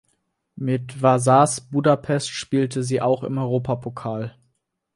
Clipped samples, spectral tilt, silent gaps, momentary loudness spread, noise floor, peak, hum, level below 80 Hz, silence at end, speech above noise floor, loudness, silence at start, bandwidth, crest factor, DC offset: under 0.1%; -6 dB/octave; none; 13 LU; -72 dBFS; -2 dBFS; none; -58 dBFS; 0.65 s; 51 dB; -21 LUFS; 0.55 s; 11.5 kHz; 20 dB; under 0.1%